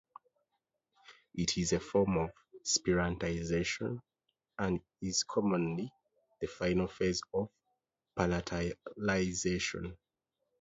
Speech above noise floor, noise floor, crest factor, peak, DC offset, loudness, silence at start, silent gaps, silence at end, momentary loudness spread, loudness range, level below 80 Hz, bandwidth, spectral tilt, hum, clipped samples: 52 dB; -86 dBFS; 22 dB; -14 dBFS; under 0.1%; -34 LUFS; 1.1 s; none; 0.65 s; 12 LU; 3 LU; -54 dBFS; 8 kHz; -4.5 dB/octave; none; under 0.1%